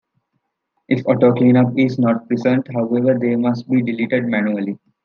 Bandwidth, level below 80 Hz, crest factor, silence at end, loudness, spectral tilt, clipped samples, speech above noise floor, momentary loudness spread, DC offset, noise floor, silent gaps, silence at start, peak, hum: 6.4 kHz; -66 dBFS; 16 dB; 0.3 s; -17 LUFS; -9 dB/octave; under 0.1%; 56 dB; 7 LU; under 0.1%; -73 dBFS; none; 0.9 s; -2 dBFS; none